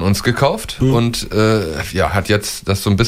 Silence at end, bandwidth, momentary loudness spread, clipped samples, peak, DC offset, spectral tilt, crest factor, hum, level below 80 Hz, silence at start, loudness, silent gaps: 0 s; 16 kHz; 4 LU; under 0.1%; -2 dBFS; under 0.1%; -5.5 dB/octave; 14 dB; none; -34 dBFS; 0 s; -16 LUFS; none